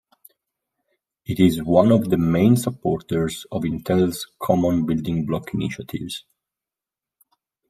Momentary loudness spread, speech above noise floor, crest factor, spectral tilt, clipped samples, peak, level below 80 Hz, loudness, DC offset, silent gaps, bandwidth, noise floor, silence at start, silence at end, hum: 13 LU; 69 dB; 20 dB; -7 dB/octave; under 0.1%; -2 dBFS; -50 dBFS; -21 LUFS; under 0.1%; none; 15.5 kHz; -89 dBFS; 1.3 s; 1.5 s; none